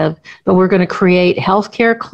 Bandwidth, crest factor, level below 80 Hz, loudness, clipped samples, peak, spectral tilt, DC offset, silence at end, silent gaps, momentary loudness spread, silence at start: 7.8 kHz; 12 dB; -50 dBFS; -13 LUFS; under 0.1%; 0 dBFS; -7.5 dB/octave; under 0.1%; 0.05 s; none; 5 LU; 0 s